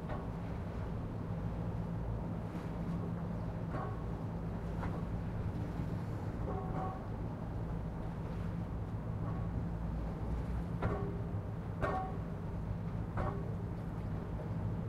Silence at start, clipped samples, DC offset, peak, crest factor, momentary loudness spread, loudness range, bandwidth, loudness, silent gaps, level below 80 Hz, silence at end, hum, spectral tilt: 0 s; under 0.1%; under 0.1%; -22 dBFS; 16 dB; 3 LU; 1 LU; 11 kHz; -40 LUFS; none; -46 dBFS; 0 s; none; -9 dB/octave